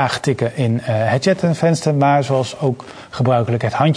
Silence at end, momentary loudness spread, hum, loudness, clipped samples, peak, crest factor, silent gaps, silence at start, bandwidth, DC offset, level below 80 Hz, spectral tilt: 0 s; 6 LU; none; -17 LUFS; under 0.1%; 0 dBFS; 16 dB; none; 0 s; 10.5 kHz; under 0.1%; -54 dBFS; -6.5 dB/octave